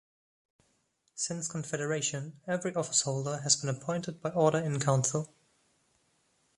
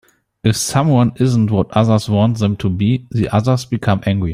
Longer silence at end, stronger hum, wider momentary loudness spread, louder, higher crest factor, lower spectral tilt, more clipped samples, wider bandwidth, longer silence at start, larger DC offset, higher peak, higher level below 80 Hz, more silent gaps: first, 1.3 s vs 0 s; neither; first, 8 LU vs 4 LU; second, -31 LUFS vs -16 LUFS; first, 22 dB vs 14 dB; second, -4 dB/octave vs -6.5 dB/octave; neither; second, 11.5 kHz vs 15 kHz; first, 1.15 s vs 0.45 s; neither; second, -10 dBFS vs 0 dBFS; second, -70 dBFS vs -44 dBFS; neither